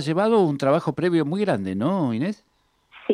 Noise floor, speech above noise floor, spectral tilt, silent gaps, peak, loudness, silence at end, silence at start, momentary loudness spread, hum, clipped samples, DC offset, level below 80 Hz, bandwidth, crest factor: -53 dBFS; 32 dB; -7.5 dB/octave; none; -8 dBFS; -22 LUFS; 0 s; 0 s; 9 LU; none; under 0.1%; under 0.1%; -66 dBFS; 11.5 kHz; 14 dB